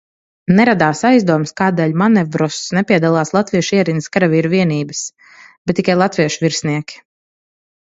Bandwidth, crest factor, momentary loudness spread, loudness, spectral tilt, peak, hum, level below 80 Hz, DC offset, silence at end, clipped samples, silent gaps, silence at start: 8 kHz; 16 dB; 10 LU; -15 LUFS; -5.5 dB/octave; 0 dBFS; none; -54 dBFS; under 0.1%; 0.95 s; under 0.1%; 5.58-5.65 s; 0.5 s